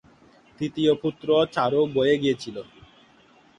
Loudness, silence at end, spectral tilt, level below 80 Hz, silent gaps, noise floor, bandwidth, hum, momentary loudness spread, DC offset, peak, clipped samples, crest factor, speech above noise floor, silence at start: -23 LUFS; 0.95 s; -6 dB/octave; -60 dBFS; none; -56 dBFS; 9.6 kHz; none; 11 LU; under 0.1%; -8 dBFS; under 0.1%; 16 dB; 33 dB; 0.6 s